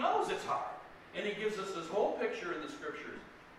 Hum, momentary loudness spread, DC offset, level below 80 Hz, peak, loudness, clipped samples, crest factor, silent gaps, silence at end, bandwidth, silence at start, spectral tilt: none; 12 LU; under 0.1%; -70 dBFS; -20 dBFS; -37 LUFS; under 0.1%; 18 dB; none; 0 s; 13 kHz; 0 s; -4 dB/octave